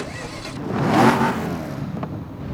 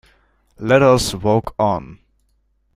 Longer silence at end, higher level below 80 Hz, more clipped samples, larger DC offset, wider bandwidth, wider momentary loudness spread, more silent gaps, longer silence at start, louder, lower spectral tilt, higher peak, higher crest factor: second, 0 s vs 0.8 s; about the same, -46 dBFS vs -42 dBFS; neither; neither; first, 17.5 kHz vs 15.5 kHz; first, 15 LU vs 11 LU; neither; second, 0 s vs 0.6 s; second, -22 LUFS vs -16 LUFS; about the same, -6 dB/octave vs -5.5 dB/octave; about the same, -2 dBFS vs -2 dBFS; about the same, 20 dB vs 18 dB